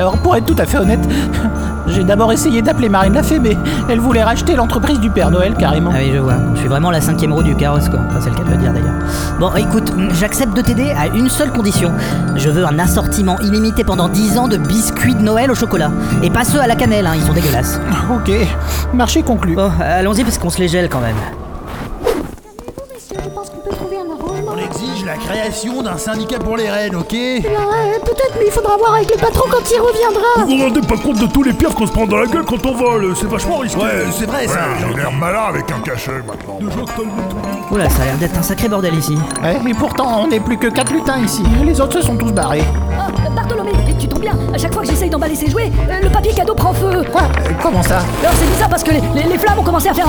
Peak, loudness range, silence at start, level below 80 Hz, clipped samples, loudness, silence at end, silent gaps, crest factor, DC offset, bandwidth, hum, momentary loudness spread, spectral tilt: 0 dBFS; 6 LU; 0 s; -22 dBFS; under 0.1%; -14 LUFS; 0 s; none; 14 dB; under 0.1%; over 20 kHz; none; 8 LU; -5.5 dB/octave